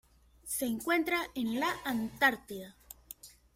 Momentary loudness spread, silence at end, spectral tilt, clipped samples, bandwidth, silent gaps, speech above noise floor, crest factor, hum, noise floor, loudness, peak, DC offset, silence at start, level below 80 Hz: 21 LU; 0.25 s; -3 dB/octave; under 0.1%; 16.5 kHz; none; 21 dB; 20 dB; none; -53 dBFS; -32 LUFS; -14 dBFS; under 0.1%; 0.45 s; -64 dBFS